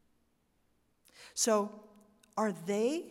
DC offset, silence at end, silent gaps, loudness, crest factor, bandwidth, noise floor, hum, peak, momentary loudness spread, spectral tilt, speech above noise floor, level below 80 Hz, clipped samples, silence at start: under 0.1%; 0 s; none; -33 LUFS; 20 dB; 16 kHz; -74 dBFS; none; -16 dBFS; 12 LU; -3.5 dB/octave; 42 dB; -80 dBFS; under 0.1%; 1.2 s